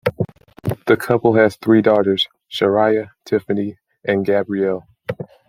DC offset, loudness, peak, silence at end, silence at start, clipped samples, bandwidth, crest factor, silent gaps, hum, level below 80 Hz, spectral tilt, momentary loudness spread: under 0.1%; -18 LUFS; 0 dBFS; 0.25 s; 0.05 s; under 0.1%; 16 kHz; 18 dB; none; none; -56 dBFS; -6.5 dB/octave; 14 LU